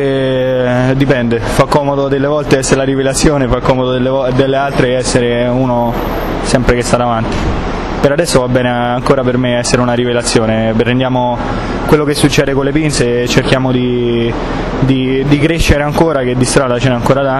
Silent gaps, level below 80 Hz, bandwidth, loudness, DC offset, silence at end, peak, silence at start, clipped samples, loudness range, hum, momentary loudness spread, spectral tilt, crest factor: none; -24 dBFS; 14 kHz; -12 LUFS; under 0.1%; 0 s; 0 dBFS; 0 s; 0.2%; 1 LU; none; 4 LU; -5.5 dB/octave; 12 dB